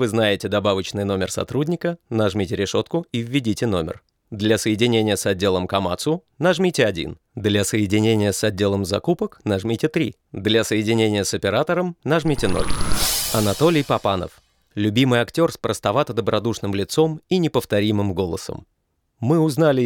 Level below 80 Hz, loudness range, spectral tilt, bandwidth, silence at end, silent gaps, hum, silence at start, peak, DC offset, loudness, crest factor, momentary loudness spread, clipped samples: -42 dBFS; 2 LU; -5 dB/octave; 19.5 kHz; 0 s; none; none; 0 s; -4 dBFS; under 0.1%; -21 LUFS; 16 dB; 7 LU; under 0.1%